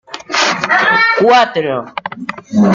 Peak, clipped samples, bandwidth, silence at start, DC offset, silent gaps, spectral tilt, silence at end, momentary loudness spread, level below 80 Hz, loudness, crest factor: 0 dBFS; under 0.1%; 7.6 kHz; 0.1 s; under 0.1%; none; -4 dB/octave; 0 s; 15 LU; -56 dBFS; -12 LUFS; 12 dB